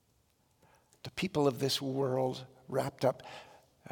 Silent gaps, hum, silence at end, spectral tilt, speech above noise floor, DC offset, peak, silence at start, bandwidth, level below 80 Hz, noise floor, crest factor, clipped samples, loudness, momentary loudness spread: none; none; 0 s; -5 dB/octave; 39 dB; under 0.1%; -16 dBFS; 1.05 s; 18 kHz; -70 dBFS; -72 dBFS; 20 dB; under 0.1%; -33 LUFS; 16 LU